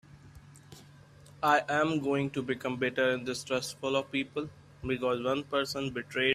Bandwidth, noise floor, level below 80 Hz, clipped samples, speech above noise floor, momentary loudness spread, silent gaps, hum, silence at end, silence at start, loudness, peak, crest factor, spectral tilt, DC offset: 15 kHz; -55 dBFS; -62 dBFS; under 0.1%; 24 dB; 8 LU; none; none; 0 s; 0.15 s; -31 LUFS; -12 dBFS; 20 dB; -4.5 dB/octave; under 0.1%